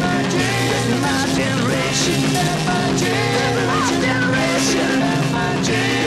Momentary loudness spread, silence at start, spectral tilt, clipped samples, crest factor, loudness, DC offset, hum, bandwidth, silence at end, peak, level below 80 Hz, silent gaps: 2 LU; 0 s; -4 dB/octave; under 0.1%; 14 dB; -17 LUFS; 0.2%; none; 15 kHz; 0 s; -4 dBFS; -42 dBFS; none